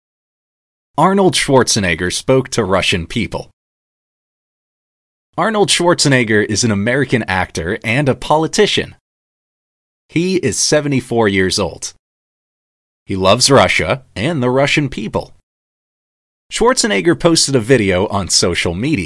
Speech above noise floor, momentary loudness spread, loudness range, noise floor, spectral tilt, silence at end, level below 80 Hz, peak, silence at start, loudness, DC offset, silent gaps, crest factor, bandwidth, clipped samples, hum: over 76 dB; 10 LU; 3 LU; under -90 dBFS; -4 dB/octave; 0 s; -42 dBFS; 0 dBFS; 1 s; -14 LUFS; under 0.1%; 3.53-5.33 s, 9.00-10.09 s, 11.99-13.06 s, 15.43-16.50 s; 16 dB; 12 kHz; under 0.1%; none